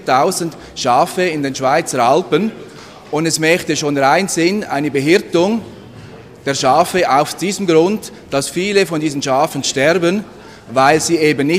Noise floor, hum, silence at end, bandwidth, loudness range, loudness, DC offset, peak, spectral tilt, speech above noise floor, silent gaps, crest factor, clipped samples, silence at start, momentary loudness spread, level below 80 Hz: -36 dBFS; none; 0 s; 15.5 kHz; 1 LU; -15 LUFS; under 0.1%; 0 dBFS; -4 dB/octave; 21 dB; none; 16 dB; under 0.1%; 0 s; 9 LU; -52 dBFS